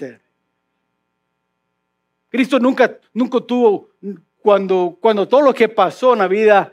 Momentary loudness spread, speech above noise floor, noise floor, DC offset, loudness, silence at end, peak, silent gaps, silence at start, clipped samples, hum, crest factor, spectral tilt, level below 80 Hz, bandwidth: 11 LU; 57 dB; -72 dBFS; under 0.1%; -15 LUFS; 0.05 s; 0 dBFS; none; 0 s; under 0.1%; none; 16 dB; -6 dB/octave; -80 dBFS; 12 kHz